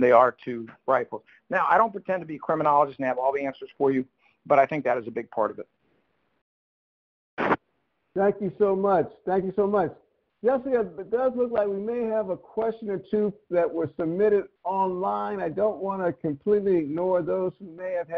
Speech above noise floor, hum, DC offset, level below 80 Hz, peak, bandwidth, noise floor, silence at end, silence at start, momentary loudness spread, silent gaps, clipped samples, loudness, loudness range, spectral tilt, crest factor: 49 dB; none; under 0.1%; -64 dBFS; -4 dBFS; 6 kHz; -74 dBFS; 0 s; 0 s; 10 LU; 6.42-7.37 s; under 0.1%; -26 LUFS; 4 LU; -9 dB/octave; 22 dB